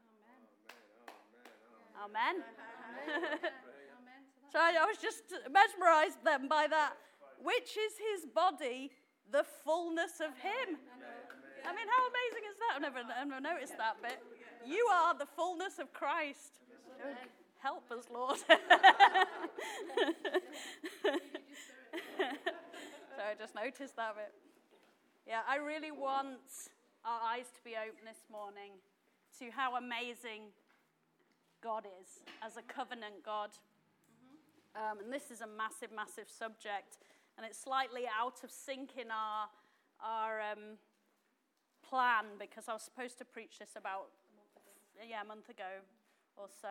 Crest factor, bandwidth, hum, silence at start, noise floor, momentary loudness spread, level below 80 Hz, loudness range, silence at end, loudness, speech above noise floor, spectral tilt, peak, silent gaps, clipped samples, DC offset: 28 dB; 17 kHz; none; 0.7 s; -80 dBFS; 21 LU; under -90 dBFS; 16 LU; 0 s; -36 LUFS; 44 dB; -1 dB/octave; -10 dBFS; none; under 0.1%; under 0.1%